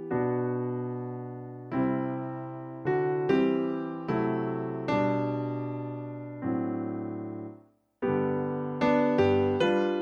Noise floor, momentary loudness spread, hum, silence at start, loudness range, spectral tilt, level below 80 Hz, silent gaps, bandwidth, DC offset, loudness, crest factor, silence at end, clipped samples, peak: -55 dBFS; 13 LU; none; 0 s; 5 LU; -8.5 dB/octave; -64 dBFS; none; 7 kHz; under 0.1%; -29 LUFS; 16 dB; 0 s; under 0.1%; -12 dBFS